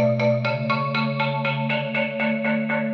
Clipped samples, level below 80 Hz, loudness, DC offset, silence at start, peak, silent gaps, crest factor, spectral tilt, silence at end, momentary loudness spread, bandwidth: under 0.1%; -78 dBFS; -23 LUFS; under 0.1%; 0 s; -8 dBFS; none; 14 dB; -8 dB/octave; 0 s; 2 LU; 6.2 kHz